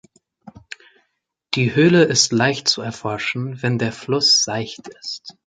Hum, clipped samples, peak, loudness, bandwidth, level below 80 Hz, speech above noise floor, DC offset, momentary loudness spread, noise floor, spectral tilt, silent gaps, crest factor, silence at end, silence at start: none; under 0.1%; -2 dBFS; -17 LUFS; 9.6 kHz; -58 dBFS; 54 dB; under 0.1%; 18 LU; -73 dBFS; -3.5 dB/octave; none; 18 dB; 0.15 s; 0.45 s